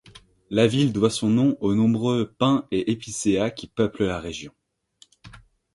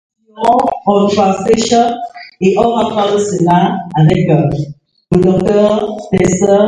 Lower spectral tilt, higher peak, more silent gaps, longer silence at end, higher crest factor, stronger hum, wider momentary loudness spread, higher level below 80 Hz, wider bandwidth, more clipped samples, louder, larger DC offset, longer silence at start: about the same, -6 dB/octave vs -6.5 dB/octave; second, -4 dBFS vs 0 dBFS; neither; first, 0.35 s vs 0 s; first, 20 dB vs 12 dB; neither; about the same, 7 LU vs 6 LU; second, -52 dBFS vs -40 dBFS; about the same, 11.5 kHz vs 11 kHz; neither; second, -23 LUFS vs -12 LUFS; neither; first, 0.5 s vs 0.35 s